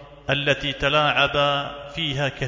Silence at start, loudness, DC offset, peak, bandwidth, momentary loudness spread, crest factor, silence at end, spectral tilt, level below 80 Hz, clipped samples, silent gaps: 0 s; -21 LUFS; under 0.1%; -6 dBFS; 7.6 kHz; 8 LU; 18 dB; 0 s; -4.5 dB/octave; -44 dBFS; under 0.1%; none